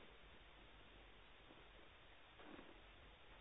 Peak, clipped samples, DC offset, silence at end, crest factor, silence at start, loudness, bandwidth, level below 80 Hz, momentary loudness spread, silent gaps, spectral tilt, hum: -46 dBFS; under 0.1%; under 0.1%; 0 s; 16 dB; 0 s; -64 LUFS; 3.9 kHz; -70 dBFS; 4 LU; none; -2 dB/octave; none